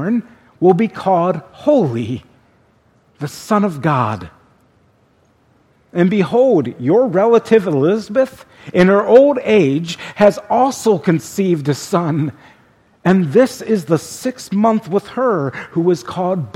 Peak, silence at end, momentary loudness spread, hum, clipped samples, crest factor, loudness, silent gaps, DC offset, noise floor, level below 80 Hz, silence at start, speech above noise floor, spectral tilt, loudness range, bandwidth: 0 dBFS; 0.05 s; 9 LU; none; under 0.1%; 16 dB; -15 LUFS; none; under 0.1%; -55 dBFS; -56 dBFS; 0 s; 41 dB; -7 dB/octave; 7 LU; 15.5 kHz